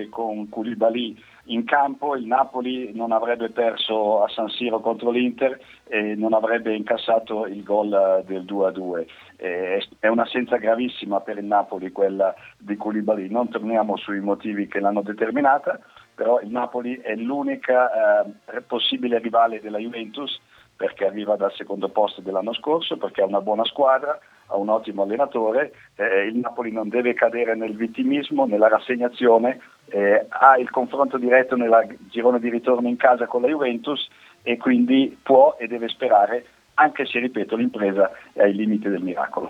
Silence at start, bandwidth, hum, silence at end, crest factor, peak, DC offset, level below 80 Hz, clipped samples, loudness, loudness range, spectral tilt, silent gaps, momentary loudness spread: 0 s; 7.2 kHz; none; 0 s; 22 dB; 0 dBFS; under 0.1%; -70 dBFS; under 0.1%; -22 LUFS; 5 LU; -6.5 dB/octave; none; 11 LU